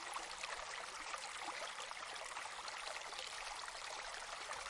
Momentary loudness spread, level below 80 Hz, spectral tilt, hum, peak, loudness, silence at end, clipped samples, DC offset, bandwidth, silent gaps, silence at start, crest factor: 1 LU; -72 dBFS; 1 dB/octave; none; -28 dBFS; -46 LUFS; 0 s; under 0.1%; under 0.1%; 11.5 kHz; none; 0 s; 20 dB